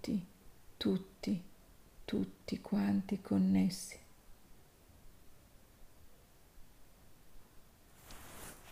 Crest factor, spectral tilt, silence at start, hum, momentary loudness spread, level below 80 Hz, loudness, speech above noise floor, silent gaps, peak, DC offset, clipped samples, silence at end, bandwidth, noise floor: 18 dB; -6.5 dB/octave; 0 s; none; 23 LU; -62 dBFS; -37 LUFS; 26 dB; none; -22 dBFS; under 0.1%; under 0.1%; 0 s; 15.5 kHz; -61 dBFS